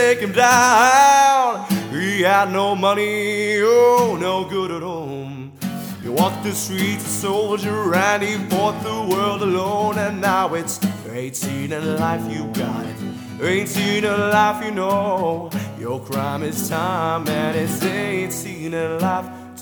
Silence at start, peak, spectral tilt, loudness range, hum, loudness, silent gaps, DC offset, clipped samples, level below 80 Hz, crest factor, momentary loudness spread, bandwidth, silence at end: 0 s; 0 dBFS; -4 dB/octave; 7 LU; none; -19 LUFS; none; under 0.1%; under 0.1%; -60 dBFS; 18 dB; 14 LU; over 20 kHz; 0 s